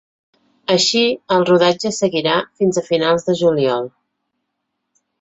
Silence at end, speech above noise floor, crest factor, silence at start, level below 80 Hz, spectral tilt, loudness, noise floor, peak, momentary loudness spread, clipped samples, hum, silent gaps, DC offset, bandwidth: 1.35 s; 59 dB; 16 dB; 0.7 s; -60 dBFS; -4 dB/octave; -16 LUFS; -75 dBFS; -2 dBFS; 6 LU; under 0.1%; none; none; under 0.1%; 8.2 kHz